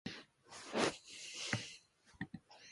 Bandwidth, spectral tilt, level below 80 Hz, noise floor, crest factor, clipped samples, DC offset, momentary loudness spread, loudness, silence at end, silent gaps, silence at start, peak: 11.5 kHz; -3.5 dB/octave; -72 dBFS; -62 dBFS; 26 dB; under 0.1%; under 0.1%; 18 LU; -42 LUFS; 0 s; none; 0.05 s; -18 dBFS